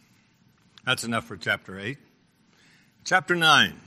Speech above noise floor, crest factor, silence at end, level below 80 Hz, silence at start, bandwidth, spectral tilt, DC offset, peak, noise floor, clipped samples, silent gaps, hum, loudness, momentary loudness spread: 38 dB; 24 dB; 0.1 s; -66 dBFS; 0.85 s; 14 kHz; -2.5 dB/octave; under 0.1%; -4 dBFS; -62 dBFS; under 0.1%; none; none; -24 LUFS; 18 LU